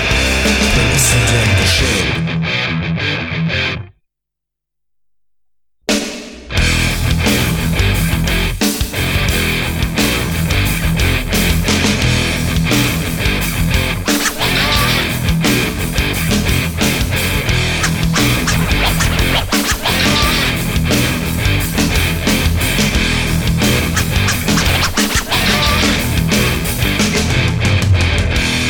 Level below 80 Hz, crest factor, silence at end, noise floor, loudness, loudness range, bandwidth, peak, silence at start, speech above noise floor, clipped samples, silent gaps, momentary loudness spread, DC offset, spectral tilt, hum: -22 dBFS; 14 dB; 0 s; -81 dBFS; -14 LUFS; 5 LU; 19.5 kHz; -2 dBFS; 0 s; 69 dB; under 0.1%; none; 5 LU; under 0.1%; -4 dB/octave; none